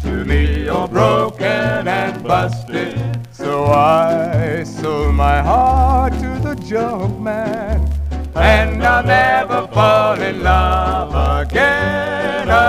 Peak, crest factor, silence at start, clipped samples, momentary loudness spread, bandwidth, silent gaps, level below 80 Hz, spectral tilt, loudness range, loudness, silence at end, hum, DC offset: 0 dBFS; 14 dB; 0 s; under 0.1%; 9 LU; 14 kHz; none; -22 dBFS; -6.5 dB/octave; 3 LU; -15 LUFS; 0 s; none; 0.2%